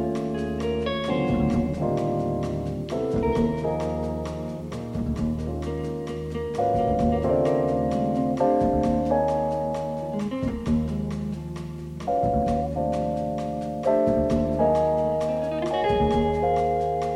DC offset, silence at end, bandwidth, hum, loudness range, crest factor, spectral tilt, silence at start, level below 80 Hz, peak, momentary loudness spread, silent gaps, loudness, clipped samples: under 0.1%; 0 s; 12.5 kHz; none; 4 LU; 14 dB; -8 dB/octave; 0 s; -38 dBFS; -10 dBFS; 8 LU; none; -25 LUFS; under 0.1%